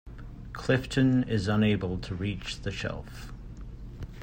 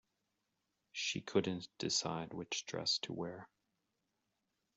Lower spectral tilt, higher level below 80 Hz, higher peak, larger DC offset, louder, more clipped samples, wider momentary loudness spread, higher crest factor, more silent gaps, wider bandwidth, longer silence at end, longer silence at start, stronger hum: first, -6.5 dB/octave vs -3 dB/octave; first, -44 dBFS vs -78 dBFS; first, -12 dBFS vs -20 dBFS; neither; first, -28 LUFS vs -39 LUFS; neither; first, 20 LU vs 9 LU; second, 18 dB vs 24 dB; neither; first, 16 kHz vs 8.2 kHz; second, 0 s vs 1.3 s; second, 0.05 s vs 0.95 s; neither